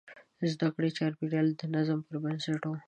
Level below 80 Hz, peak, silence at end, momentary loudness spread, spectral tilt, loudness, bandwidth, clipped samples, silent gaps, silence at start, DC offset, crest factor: -76 dBFS; -18 dBFS; 0.05 s; 5 LU; -7 dB/octave; -32 LUFS; 9 kHz; under 0.1%; none; 0.05 s; under 0.1%; 14 dB